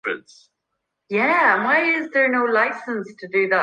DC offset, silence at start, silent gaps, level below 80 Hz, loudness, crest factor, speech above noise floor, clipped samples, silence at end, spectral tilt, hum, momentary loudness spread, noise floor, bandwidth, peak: under 0.1%; 0.05 s; none; -76 dBFS; -19 LUFS; 16 dB; 58 dB; under 0.1%; 0 s; -5.5 dB/octave; none; 13 LU; -78 dBFS; 10 kHz; -4 dBFS